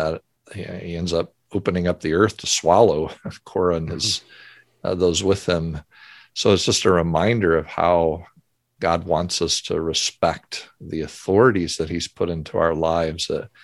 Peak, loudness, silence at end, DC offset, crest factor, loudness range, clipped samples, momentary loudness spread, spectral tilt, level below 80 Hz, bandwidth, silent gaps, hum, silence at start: -2 dBFS; -21 LUFS; 0.15 s; under 0.1%; 20 dB; 3 LU; under 0.1%; 14 LU; -4.5 dB/octave; -42 dBFS; 12.5 kHz; none; none; 0 s